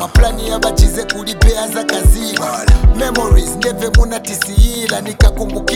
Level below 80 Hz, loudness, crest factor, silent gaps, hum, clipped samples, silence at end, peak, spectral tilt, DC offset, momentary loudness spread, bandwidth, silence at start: -14 dBFS; -14 LUFS; 12 dB; none; none; under 0.1%; 0 s; 0 dBFS; -4.5 dB/octave; under 0.1%; 5 LU; 16 kHz; 0 s